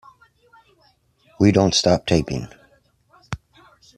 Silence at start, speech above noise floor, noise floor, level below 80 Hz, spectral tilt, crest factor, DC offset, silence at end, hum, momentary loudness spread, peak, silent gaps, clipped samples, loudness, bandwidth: 1.4 s; 43 dB; -60 dBFS; -46 dBFS; -5 dB/octave; 20 dB; under 0.1%; 0.6 s; none; 19 LU; -4 dBFS; none; under 0.1%; -18 LUFS; 12.5 kHz